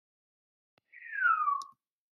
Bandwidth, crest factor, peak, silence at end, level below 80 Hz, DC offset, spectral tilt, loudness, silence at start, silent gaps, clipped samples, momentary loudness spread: 12 kHz; 18 dB; -18 dBFS; 0.45 s; under -90 dBFS; under 0.1%; 2 dB/octave; -30 LUFS; 0.95 s; none; under 0.1%; 22 LU